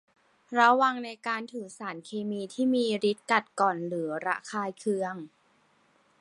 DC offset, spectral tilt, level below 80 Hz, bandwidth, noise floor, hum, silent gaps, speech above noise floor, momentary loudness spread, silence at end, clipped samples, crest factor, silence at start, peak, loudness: under 0.1%; -4.5 dB/octave; -80 dBFS; 11.5 kHz; -66 dBFS; none; none; 38 dB; 15 LU; 0.95 s; under 0.1%; 22 dB; 0.5 s; -8 dBFS; -28 LUFS